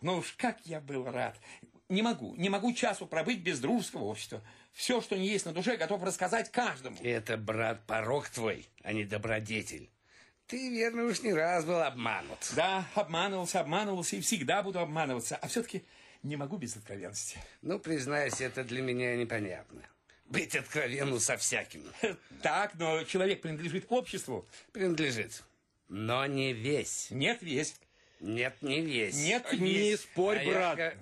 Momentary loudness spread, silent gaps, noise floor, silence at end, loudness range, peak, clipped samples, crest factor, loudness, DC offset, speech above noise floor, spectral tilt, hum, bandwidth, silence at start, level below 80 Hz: 10 LU; none; -64 dBFS; 0 s; 4 LU; -16 dBFS; under 0.1%; 18 dB; -33 LUFS; under 0.1%; 30 dB; -3.5 dB/octave; none; 13 kHz; 0 s; -68 dBFS